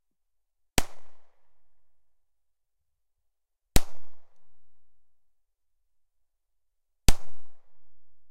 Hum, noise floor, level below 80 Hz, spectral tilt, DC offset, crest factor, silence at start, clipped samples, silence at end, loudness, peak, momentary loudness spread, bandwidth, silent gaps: none; -80 dBFS; -38 dBFS; -3.5 dB/octave; under 0.1%; 26 dB; 0.75 s; under 0.1%; 0 s; -31 LUFS; -2 dBFS; 17 LU; 15.5 kHz; none